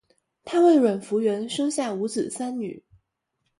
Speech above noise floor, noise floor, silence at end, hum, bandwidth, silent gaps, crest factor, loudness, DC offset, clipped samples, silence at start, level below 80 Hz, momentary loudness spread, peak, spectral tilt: 54 dB; -77 dBFS; 0.8 s; none; 11.5 kHz; none; 16 dB; -23 LUFS; under 0.1%; under 0.1%; 0.45 s; -70 dBFS; 12 LU; -8 dBFS; -5 dB/octave